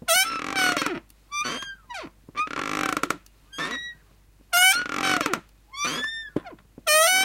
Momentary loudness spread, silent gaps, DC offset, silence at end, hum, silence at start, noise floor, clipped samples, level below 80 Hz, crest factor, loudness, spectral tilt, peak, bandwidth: 19 LU; none; under 0.1%; 0 s; none; 0.05 s; -56 dBFS; under 0.1%; -58 dBFS; 20 dB; -24 LUFS; -0.5 dB/octave; -6 dBFS; 16.5 kHz